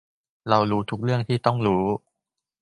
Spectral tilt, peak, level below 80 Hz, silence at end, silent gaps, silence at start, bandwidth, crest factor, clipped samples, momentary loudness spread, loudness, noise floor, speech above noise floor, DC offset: -8 dB/octave; -2 dBFS; -54 dBFS; 0.65 s; none; 0.45 s; 11 kHz; 22 dB; under 0.1%; 7 LU; -23 LUFS; -85 dBFS; 62 dB; under 0.1%